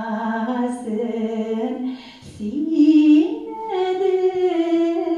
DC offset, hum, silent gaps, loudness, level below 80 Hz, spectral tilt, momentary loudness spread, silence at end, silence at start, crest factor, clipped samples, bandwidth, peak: under 0.1%; none; none; -20 LUFS; -60 dBFS; -6.5 dB/octave; 14 LU; 0 s; 0 s; 14 dB; under 0.1%; 10 kHz; -6 dBFS